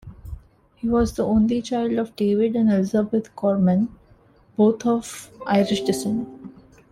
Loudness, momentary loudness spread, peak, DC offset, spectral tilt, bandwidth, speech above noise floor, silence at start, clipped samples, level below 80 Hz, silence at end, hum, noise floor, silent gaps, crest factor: -22 LUFS; 16 LU; -6 dBFS; under 0.1%; -6.5 dB/octave; 14.5 kHz; 33 dB; 0.05 s; under 0.1%; -44 dBFS; 0.4 s; none; -54 dBFS; none; 16 dB